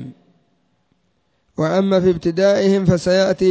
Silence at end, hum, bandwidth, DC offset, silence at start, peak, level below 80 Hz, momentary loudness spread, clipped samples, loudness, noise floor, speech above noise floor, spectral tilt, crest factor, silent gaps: 0 s; none; 8 kHz; under 0.1%; 0 s; -2 dBFS; -46 dBFS; 8 LU; under 0.1%; -16 LUFS; -66 dBFS; 51 dB; -6.5 dB/octave; 16 dB; none